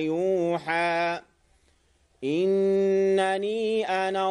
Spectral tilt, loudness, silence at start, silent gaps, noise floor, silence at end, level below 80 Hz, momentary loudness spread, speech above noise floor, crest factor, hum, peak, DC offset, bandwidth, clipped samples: -5.5 dB/octave; -25 LUFS; 0 s; none; -65 dBFS; 0 s; -66 dBFS; 7 LU; 40 dB; 14 dB; none; -12 dBFS; under 0.1%; 10.5 kHz; under 0.1%